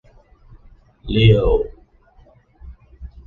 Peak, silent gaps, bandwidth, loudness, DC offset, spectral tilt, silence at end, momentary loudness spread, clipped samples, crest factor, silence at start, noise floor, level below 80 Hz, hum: -2 dBFS; none; 4.3 kHz; -17 LUFS; under 0.1%; -9 dB/octave; 0.2 s; 28 LU; under 0.1%; 20 dB; 1.05 s; -51 dBFS; -30 dBFS; none